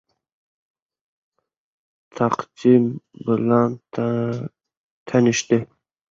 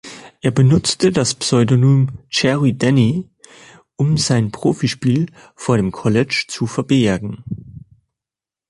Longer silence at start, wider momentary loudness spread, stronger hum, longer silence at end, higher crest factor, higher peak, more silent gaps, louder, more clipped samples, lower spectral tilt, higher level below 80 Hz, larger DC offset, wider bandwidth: first, 2.15 s vs 0.05 s; about the same, 12 LU vs 12 LU; neither; second, 0.45 s vs 0.9 s; about the same, 20 dB vs 16 dB; about the same, -2 dBFS vs -2 dBFS; first, 4.77-5.06 s vs none; second, -21 LUFS vs -17 LUFS; neither; about the same, -6 dB/octave vs -5.5 dB/octave; second, -62 dBFS vs -46 dBFS; neither; second, 7.8 kHz vs 11.5 kHz